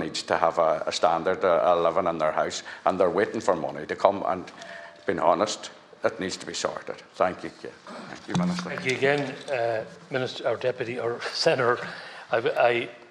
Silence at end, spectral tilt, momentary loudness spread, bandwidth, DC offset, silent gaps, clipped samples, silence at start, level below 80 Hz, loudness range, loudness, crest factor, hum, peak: 0.05 s; -4.5 dB/octave; 15 LU; 11.5 kHz; under 0.1%; none; under 0.1%; 0 s; -66 dBFS; 5 LU; -26 LUFS; 26 dB; none; 0 dBFS